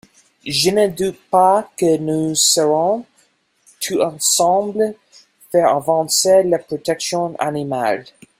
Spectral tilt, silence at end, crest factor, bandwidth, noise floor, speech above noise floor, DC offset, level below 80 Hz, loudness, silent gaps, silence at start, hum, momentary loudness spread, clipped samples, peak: -3 dB/octave; 0.35 s; 16 dB; 16 kHz; -59 dBFS; 43 dB; under 0.1%; -58 dBFS; -17 LUFS; none; 0.45 s; none; 9 LU; under 0.1%; -2 dBFS